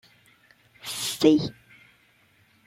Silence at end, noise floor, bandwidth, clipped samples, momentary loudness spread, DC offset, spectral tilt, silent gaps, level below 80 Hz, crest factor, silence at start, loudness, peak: 1.15 s; -62 dBFS; 16.5 kHz; under 0.1%; 15 LU; under 0.1%; -4.5 dB/octave; none; -64 dBFS; 22 dB; 0.85 s; -24 LUFS; -6 dBFS